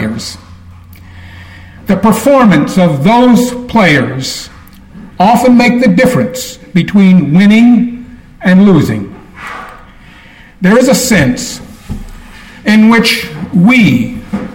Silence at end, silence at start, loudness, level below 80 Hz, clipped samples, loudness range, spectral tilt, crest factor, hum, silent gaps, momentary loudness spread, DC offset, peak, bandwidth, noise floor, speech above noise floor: 0 s; 0 s; -8 LUFS; -36 dBFS; under 0.1%; 4 LU; -5.5 dB/octave; 10 dB; none; none; 19 LU; under 0.1%; 0 dBFS; 17.5 kHz; -36 dBFS; 29 dB